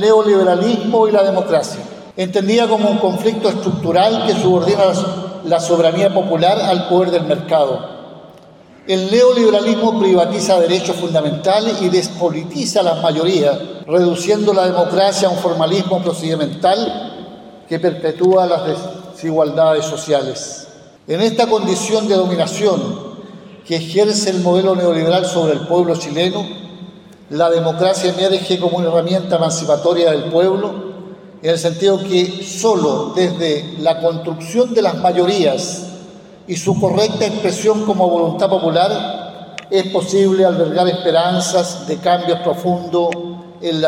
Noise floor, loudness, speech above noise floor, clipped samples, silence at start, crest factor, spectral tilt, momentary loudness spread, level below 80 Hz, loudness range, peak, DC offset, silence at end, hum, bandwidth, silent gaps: -42 dBFS; -15 LUFS; 28 dB; under 0.1%; 0 s; 14 dB; -5 dB/octave; 12 LU; -60 dBFS; 3 LU; 0 dBFS; under 0.1%; 0 s; none; 15.5 kHz; none